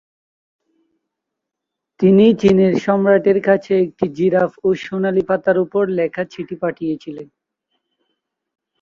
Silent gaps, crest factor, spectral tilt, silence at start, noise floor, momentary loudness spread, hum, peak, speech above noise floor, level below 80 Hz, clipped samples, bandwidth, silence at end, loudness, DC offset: none; 16 dB; -8 dB/octave; 2 s; -81 dBFS; 13 LU; none; -2 dBFS; 66 dB; -56 dBFS; under 0.1%; 7.2 kHz; 1.55 s; -16 LUFS; under 0.1%